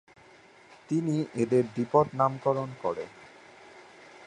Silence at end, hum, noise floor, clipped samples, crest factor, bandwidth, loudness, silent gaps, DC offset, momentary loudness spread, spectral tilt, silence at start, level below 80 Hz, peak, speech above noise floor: 0 s; none; -55 dBFS; under 0.1%; 20 dB; 10.5 kHz; -28 LUFS; none; under 0.1%; 8 LU; -8 dB/octave; 0.9 s; -68 dBFS; -10 dBFS; 28 dB